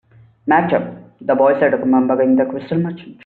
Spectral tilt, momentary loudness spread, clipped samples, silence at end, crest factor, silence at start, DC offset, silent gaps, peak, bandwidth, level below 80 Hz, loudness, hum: -6.5 dB/octave; 12 LU; under 0.1%; 0.1 s; 14 dB; 0.45 s; under 0.1%; none; -2 dBFS; 4.4 kHz; -58 dBFS; -16 LUFS; none